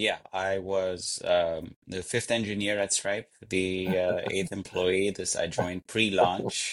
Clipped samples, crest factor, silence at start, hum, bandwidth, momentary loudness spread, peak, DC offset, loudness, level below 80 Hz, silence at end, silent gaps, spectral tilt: under 0.1%; 20 dB; 0 s; none; 16 kHz; 6 LU; -10 dBFS; under 0.1%; -28 LUFS; -60 dBFS; 0 s; 1.76-1.82 s; -3.5 dB/octave